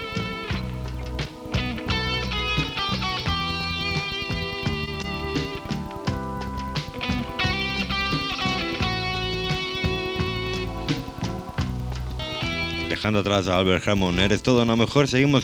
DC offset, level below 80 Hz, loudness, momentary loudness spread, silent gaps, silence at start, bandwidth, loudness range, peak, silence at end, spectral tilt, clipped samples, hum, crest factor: under 0.1%; -36 dBFS; -25 LUFS; 10 LU; none; 0 s; 18.5 kHz; 5 LU; -4 dBFS; 0 s; -5 dB/octave; under 0.1%; none; 22 dB